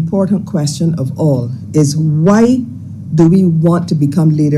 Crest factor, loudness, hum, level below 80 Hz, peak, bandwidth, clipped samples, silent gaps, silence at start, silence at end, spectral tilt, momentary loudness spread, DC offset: 10 dB; -12 LUFS; none; -46 dBFS; 0 dBFS; 12 kHz; under 0.1%; none; 0 s; 0 s; -7.5 dB/octave; 8 LU; under 0.1%